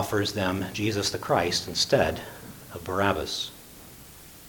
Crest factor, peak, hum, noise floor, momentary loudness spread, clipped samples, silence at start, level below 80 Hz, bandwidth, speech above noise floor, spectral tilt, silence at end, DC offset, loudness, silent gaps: 22 dB; -6 dBFS; none; -47 dBFS; 22 LU; under 0.1%; 0 s; -52 dBFS; 19 kHz; 21 dB; -4 dB/octave; 0 s; under 0.1%; -26 LUFS; none